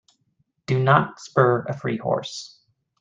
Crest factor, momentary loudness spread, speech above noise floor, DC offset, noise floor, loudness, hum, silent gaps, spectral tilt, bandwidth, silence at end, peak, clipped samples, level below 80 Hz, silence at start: 22 dB; 18 LU; 48 dB; under 0.1%; -70 dBFS; -22 LUFS; none; none; -6.5 dB/octave; 7.8 kHz; 0.55 s; -2 dBFS; under 0.1%; -62 dBFS; 0.7 s